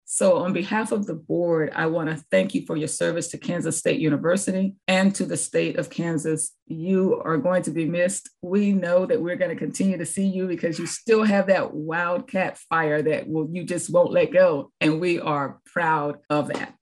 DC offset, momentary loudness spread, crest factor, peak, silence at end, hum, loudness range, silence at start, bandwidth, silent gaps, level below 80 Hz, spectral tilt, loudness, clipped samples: under 0.1%; 7 LU; 16 dB; -6 dBFS; 0.1 s; none; 2 LU; 0.1 s; 12.5 kHz; 6.62-6.66 s; -70 dBFS; -5 dB/octave; -23 LUFS; under 0.1%